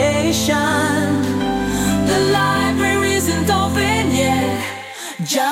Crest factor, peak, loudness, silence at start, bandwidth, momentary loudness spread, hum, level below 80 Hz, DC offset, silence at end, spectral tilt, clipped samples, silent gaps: 14 dB; -2 dBFS; -17 LUFS; 0 s; 16.5 kHz; 5 LU; none; -40 dBFS; under 0.1%; 0 s; -4.5 dB/octave; under 0.1%; none